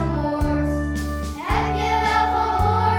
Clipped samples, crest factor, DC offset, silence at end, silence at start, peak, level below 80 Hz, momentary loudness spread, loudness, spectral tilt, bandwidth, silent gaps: under 0.1%; 12 dB; under 0.1%; 0 s; 0 s; -8 dBFS; -28 dBFS; 7 LU; -21 LUFS; -6.5 dB/octave; 17.5 kHz; none